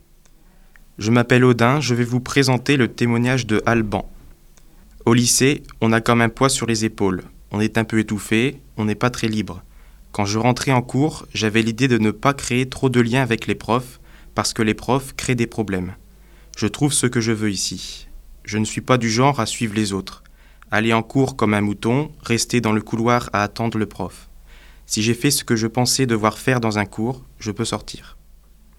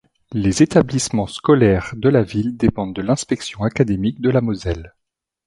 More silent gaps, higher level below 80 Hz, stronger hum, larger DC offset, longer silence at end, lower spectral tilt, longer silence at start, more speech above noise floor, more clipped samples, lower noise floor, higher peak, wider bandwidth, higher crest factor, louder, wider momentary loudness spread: neither; second, -44 dBFS vs -38 dBFS; neither; neither; about the same, 0.6 s vs 0.6 s; second, -4.5 dB/octave vs -6 dB/octave; first, 1 s vs 0.3 s; second, 30 dB vs 62 dB; neither; second, -49 dBFS vs -79 dBFS; about the same, 0 dBFS vs 0 dBFS; first, 16.5 kHz vs 11.5 kHz; about the same, 20 dB vs 18 dB; about the same, -19 LUFS vs -18 LUFS; about the same, 10 LU vs 10 LU